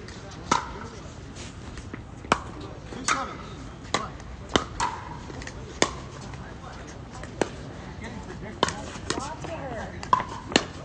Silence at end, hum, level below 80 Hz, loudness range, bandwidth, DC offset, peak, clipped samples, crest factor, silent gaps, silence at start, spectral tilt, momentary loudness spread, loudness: 0 s; none; -46 dBFS; 4 LU; 10 kHz; under 0.1%; -2 dBFS; under 0.1%; 30 dB; none; 0 s; -3.5 dB/octave; 14 LU; -31 LUFS